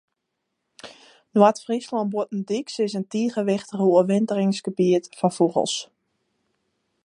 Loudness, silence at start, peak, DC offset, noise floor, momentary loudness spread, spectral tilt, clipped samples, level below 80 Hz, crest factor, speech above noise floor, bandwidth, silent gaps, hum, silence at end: -23 LUFS; 0.85 s; -2 dBFS; under 0.1%; -79 dBFS; 9 LU; -6 dB/octave; under 0.1%; -74 dBFS; 22 dB; 57 dB; 11 kHz; none; none; 1.2 s